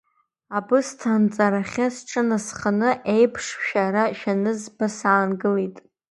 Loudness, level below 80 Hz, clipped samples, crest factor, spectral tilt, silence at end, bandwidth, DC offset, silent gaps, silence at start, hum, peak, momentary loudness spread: -22 LUFS; -64 dBFS; under 0.1%; 18 dB; -5.5 dB/octave; 0.35 s; 11.5 kHz; under 0.1%; none; 0.5 s; none; -4 dBFS; 7 LU